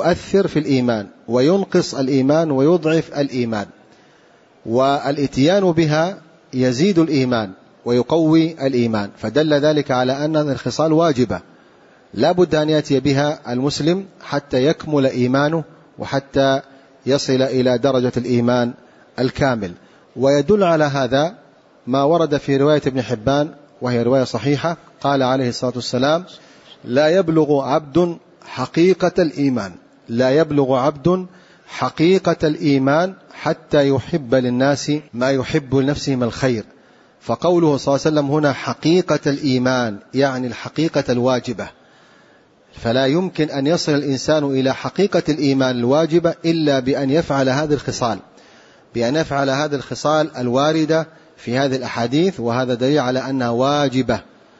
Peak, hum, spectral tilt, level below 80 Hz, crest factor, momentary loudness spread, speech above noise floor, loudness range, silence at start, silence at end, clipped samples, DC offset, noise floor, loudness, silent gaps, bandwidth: -4 dBFS; none; -6 dB/octave; -50 dBFS; 14 dB; 9 LU; 34 dB; 2 LU; 0 s; 0.35 s; under 0.1%; under 0.1%; -51 dBFS; -18 LUFS; none; 8 kHz